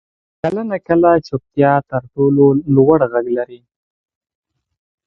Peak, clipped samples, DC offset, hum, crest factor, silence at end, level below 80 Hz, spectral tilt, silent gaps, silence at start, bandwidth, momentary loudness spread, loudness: 0 dBFS; under 0.1%; under 0.1%; none; 16 dB; 1.5 s; -50 dBFS; -10 dB/octave; none; 0.45 s; 6 kHz; 11 LU; -15 LUFS